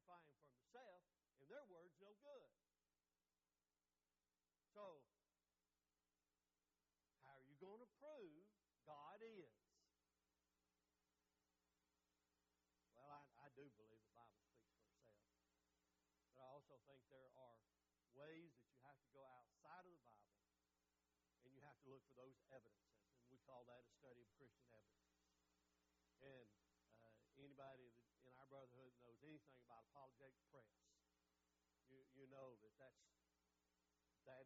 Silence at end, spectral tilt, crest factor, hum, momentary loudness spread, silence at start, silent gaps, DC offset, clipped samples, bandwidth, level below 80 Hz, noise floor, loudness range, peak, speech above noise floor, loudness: 0 s; -4.5 dB/octave; 20 dB; none; 6 LU; 0.05 s; none; under 0.1%; under 0.1%; 7.4 kHz; under -90 dBFS; under -90 dBFS; 3 LU; -50 dBFS; over 22 dB; -66 LUFS